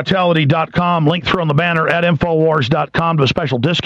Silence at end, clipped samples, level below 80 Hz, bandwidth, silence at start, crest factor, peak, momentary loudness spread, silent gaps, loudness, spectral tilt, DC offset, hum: 0.05 s; under 0.1%; -42 dBFS; 7.8 kHz; 0 s; 12 dB; -2 dBFS; 2 LU; none; -15 LUFS; -7 dB/octave; under 0.1%; none